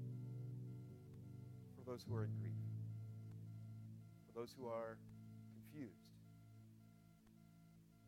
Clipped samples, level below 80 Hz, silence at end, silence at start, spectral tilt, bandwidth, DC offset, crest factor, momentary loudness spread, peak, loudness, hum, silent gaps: under 0.1%; -78 dBFS; 0 s; 0 s; -8 dB/octave; 16 kHz; under 0.1%; 20 dB; 19 LU; -32 dBFS; -52 LUFS; none; none